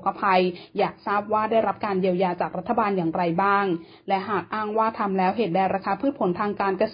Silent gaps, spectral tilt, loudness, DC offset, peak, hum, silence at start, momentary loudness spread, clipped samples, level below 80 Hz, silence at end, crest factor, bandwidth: none; -11 dB/octave; -24 LUFS; under 0.1%; -8 dBFS; none; 0 s; 6 LU; under 0.1%; -62 dBFS; 0 s; 16 dB; 5.2 kHz